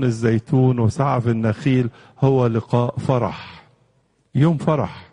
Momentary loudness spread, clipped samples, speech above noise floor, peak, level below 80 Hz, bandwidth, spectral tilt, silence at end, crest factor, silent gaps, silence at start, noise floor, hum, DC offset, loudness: 8 LU; under 0.1%; 44 dB; -4 dBFS; -52 dBFS; 10 kHz; -8.5 dB/octave; 0.1 s; 16 dB; none; 0 s; -62 dBFS; none; under 0.1%; -20 LUFS